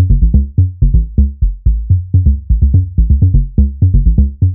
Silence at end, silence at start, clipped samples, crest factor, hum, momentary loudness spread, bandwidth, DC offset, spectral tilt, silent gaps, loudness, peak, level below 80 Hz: 0 s; 0 s; under 0.1%; 10 dB; none; 4 LU; 0.8 kHz; under 0.1%; -17 dB/octave; none; -13 LUFS; 0 dBFS; -12 dBFS